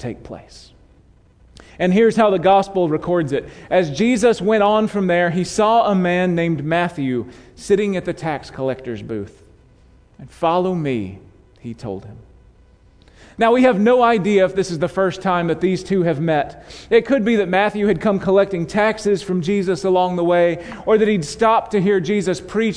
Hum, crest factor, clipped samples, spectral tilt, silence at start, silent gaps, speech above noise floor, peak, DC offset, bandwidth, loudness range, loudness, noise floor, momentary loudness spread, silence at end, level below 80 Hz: none; 16 dB; under 0.1%; -6 dB/octave; 0 s; none; 33 dB; -2 dBFS; under 0.1%; 10.5 kHz; 8 LU; -18 LUFS; -51 dBFS; 13 LU; 0 s; -48 dBFS